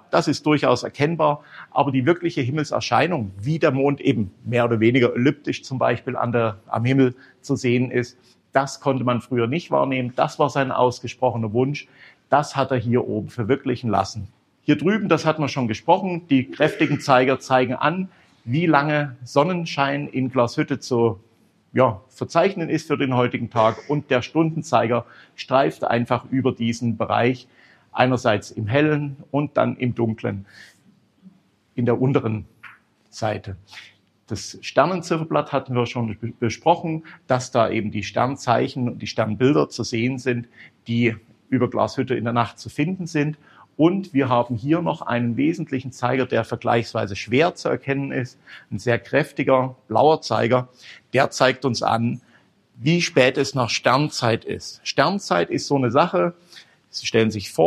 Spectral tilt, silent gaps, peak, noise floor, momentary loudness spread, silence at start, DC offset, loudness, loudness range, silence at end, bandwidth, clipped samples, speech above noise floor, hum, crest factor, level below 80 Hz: -6 dB/octave; none; 0 dBFS; -58 dBFS; 9 LU; 0.1 s; under 0.1%; -21 LUFS; 4 LU; 0 s; 12.5 kHz; under 0.1%; 36 dB; none; 22 dB; -62 dBFS